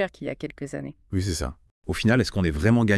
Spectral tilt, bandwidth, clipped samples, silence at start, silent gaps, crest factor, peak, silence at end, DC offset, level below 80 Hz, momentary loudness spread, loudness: -6 dB/octave; 12 kHz; under 0.1%; 0 s; 1.71-1.82 s; 18 dB; -6 dBFS; 0 s; under 0.1%; -42 dBFS; 13 LU; -26 LUFS